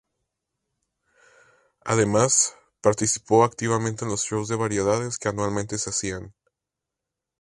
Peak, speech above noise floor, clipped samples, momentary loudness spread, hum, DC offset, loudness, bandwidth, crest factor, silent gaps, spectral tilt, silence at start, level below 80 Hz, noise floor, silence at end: -4 dBFS; 63 dB; under 0.1%; 8 LU; none; under 0.1%; -23 LUFS; 11.5 kHz; 22 dB; none; -4 dB/octave; 1.85 s; -54 dBFS; -86 dBFS; 1.1 s